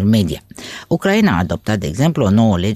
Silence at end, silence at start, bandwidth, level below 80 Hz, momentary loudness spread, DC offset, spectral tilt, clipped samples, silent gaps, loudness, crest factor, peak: 0 s; 0 s; 14.5 kHz; -38 dBFS; 13 LU; under 0.1%; -6.5 dB/octave; under 0.1%; none; -16 LUFS; 12 dB; -2 dBFS